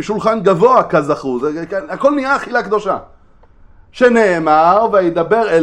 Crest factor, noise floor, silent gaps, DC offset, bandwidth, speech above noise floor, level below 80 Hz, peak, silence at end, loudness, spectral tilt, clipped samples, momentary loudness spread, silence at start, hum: 14 dB; -44 dBFS; none; under 0.1%; 9.8 kHz; 31 dB; -46 dBFS; 0 dBFS; 0 s; -14 LUFS; -6 dB/octave; under 0.1%; 9 LU; 0 s; none